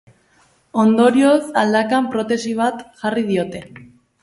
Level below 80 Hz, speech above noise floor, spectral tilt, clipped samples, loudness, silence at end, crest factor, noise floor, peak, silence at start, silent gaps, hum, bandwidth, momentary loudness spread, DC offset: -60 dBFS; 40 dB; -5.5 dB/octave; under 0.1%; -17 LUFS; 0.4 s; 16 dB; -57 dBFS; -2 dBFS; 0.75 s; none; none; 11.5 kHz; 12 LU; under 0.1%